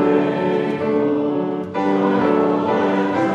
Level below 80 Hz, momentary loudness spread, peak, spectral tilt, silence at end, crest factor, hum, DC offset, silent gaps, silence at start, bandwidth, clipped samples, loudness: -64 dBFS; 4 LU; -4 dBFS; -8 dB/octave; 0 s; 14 dB; none; under 0.1%; none; 0 s; 7.6 kHz; under 0.1%; -19 LUFS